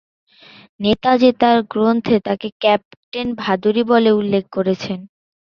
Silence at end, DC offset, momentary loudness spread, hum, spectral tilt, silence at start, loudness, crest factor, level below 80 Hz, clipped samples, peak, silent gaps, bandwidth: 0.5 s; under 0.1%; 11 LU; none; -7 dB/octave; 0.8 s; -17 LUFS; 16 dB; -52 dBFS; under 0.1%; -2 dBFS; 2.52-2.60 s, 2.85-2.91 s, 2.97-3.12 s; 6.8 kHz